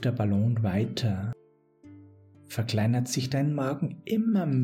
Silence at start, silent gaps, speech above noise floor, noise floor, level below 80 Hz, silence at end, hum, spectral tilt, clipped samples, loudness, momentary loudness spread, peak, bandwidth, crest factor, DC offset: 0 s; none; 29 dB; -55 dBFS; -64 dBFS; 0 s; none; -6.5 dB/octave; under 0.1%; -28 LUFS; 8 LU; -16 dBFS; 15.5 kHz; 12 dB; under 0.1%